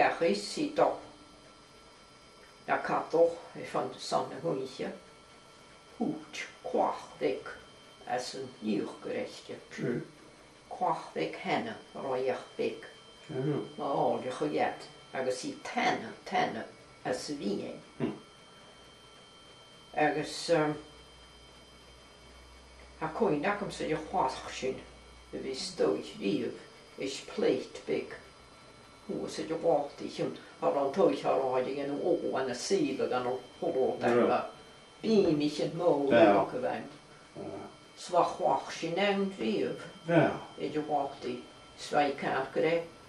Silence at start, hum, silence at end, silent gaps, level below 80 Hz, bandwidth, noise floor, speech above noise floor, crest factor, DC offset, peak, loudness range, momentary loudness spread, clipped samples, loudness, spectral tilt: 0 s; none; 0 s; none; -66 dBFS; 12 kHz; -56 dBFS; 25 dB; 22 dB; under 0.1%; -10 dBFS; 8 LU; 18 LU; under 0.1%; -32 LUFS; -5 dB/octave